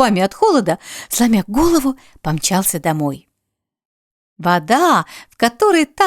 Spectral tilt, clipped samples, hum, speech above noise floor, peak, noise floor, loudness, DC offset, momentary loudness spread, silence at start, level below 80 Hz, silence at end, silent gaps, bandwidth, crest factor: -4.5 dB/octave; under 0.1%; none; 62 dB; 0 dBFS; -78 dBFS; -16 LUFS; under 0.1%; 10 LU; 0 s; -42 dBFS; 0 s; 3.85-4.36 s; 19 kHz; 16 dB